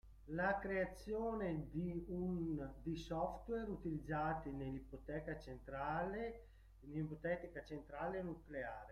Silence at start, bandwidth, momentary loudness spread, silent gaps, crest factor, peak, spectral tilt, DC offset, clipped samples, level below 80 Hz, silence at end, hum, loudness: 0.05 s; 13.5 kHz; 9 LU; none; 18 dB; -26 dBFS; -8 dB/octave; under 0.1%; under 0.1%; -58 dBFS; 0 s; none; -45 LUFS